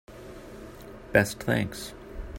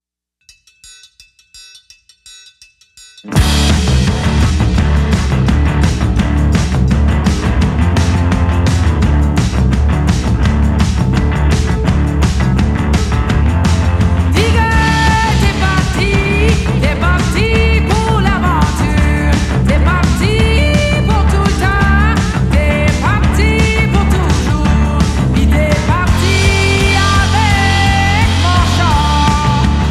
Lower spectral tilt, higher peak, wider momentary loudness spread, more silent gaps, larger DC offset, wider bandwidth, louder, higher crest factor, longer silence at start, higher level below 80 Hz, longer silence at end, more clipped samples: about the same, -5 dB/octave vs -5.5 dB/octave; second, -6 dBFS vs 0 dBFS; first, 20 LU vs 3 LU; neither; neither; first, 16.5 kHz vs 13 kHz; second, -27 LUFS vs -12 LUFS; first, 24 dB vs 10 dB; second, 0.1 s vs 1.55 s; second, -46 dBFS vs -16 dBFS; about the same, 0 s vs 0 s; neither